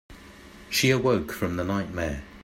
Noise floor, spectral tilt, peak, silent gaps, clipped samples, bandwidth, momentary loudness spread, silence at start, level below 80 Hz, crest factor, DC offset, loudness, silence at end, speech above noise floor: -47 dBFS; -4.5 dB/octave; -10 dBFS; none; under 0.1%; 16 kHz; 9 LU; 0.1 s; -48 dBFS; 18 dB; under 0.1%; -26 LUFS; 0 s; 22 dB